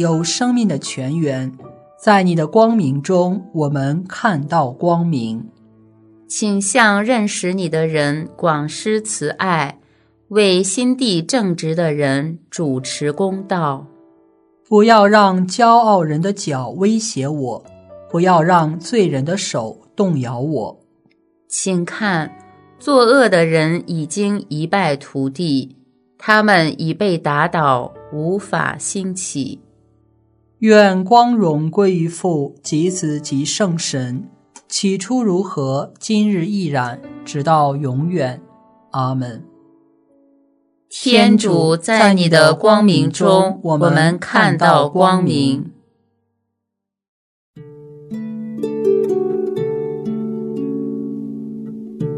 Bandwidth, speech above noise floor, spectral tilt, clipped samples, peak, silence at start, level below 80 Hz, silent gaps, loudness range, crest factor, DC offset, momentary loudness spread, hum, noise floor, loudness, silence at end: 11 kHz; 64 dB; -5 dB/octave; under 0.1%; 0 dBFS; 0 s; -62 dBFS; 47.08-47.54 s; 8 LU; 16 dB; under 0.1%; 13 LU; none; -79 dBFS; -16 LUFS; 0 s